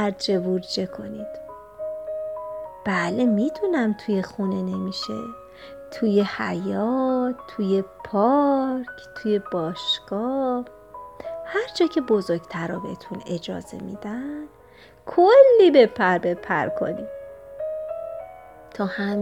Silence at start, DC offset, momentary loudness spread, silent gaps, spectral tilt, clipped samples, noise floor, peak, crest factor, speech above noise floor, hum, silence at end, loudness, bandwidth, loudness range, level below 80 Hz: 0 s; under 0.1%; 18 LU; none; -6 dB/octave; under 0.1%; -50 dBFS; -2 dBFS; 22 dB; 28 dB; none; 0 s; -23 LUFS; 11 kHz; 8 LU; -60 dBFS